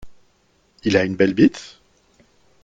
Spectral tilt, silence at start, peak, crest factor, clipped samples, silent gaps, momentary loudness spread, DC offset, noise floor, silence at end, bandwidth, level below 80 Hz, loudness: -6 dB/octave; 0.05 s; -2 dBFS; 20 dB; under 0.1%; none; 21 LU; under 0.1%; -61 dBFS; 1 s; 7.8 kHz; -54 dBFS; -18 LUFS